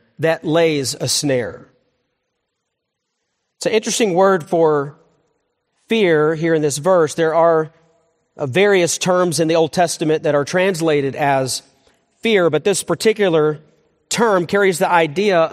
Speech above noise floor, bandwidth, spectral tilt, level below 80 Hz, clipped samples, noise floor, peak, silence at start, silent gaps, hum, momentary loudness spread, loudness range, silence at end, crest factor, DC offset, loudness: 60 dB; 15 kHz; -4 dB/octave; -62 dBFS; under 0.1%; -76 dBFS; 0 dBFS; 0.2 s; none; none; 7 LU; 5 LU; 0 s; 18 dB; under 0.1%; -16 LUFS